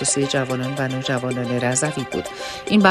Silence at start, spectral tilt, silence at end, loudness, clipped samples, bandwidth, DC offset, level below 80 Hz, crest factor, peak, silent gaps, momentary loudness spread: 0 s; -4 dB/octave; 0 s; -22 LUFS; under 0.1%; 13.5 kHz; under 0.1%; -54 dBFS; 20 dB; 0 dBFS; none; 8 LU